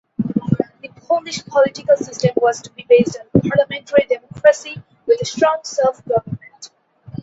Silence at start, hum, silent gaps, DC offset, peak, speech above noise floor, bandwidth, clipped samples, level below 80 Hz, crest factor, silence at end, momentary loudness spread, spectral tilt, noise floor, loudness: 0.2 s; none; none; under 0.1%; 0 dBFS; 27 dB; 8 kHz; under 0.1%; -52 dBFS; 18 dB; 0.55 s; 15 LU; -5.5 dB/octave; -43 dBFS; -18 LUFS